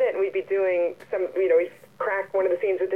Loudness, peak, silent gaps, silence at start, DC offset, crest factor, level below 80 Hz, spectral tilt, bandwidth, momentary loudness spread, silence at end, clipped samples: -25 LUFS; -12 dBFS; none; 0 s; 0.1%; 14 dB; -76 dBFS; -6.5 dB/octave; 4.7 kHz; 7 LU; 0 s; under 0.1%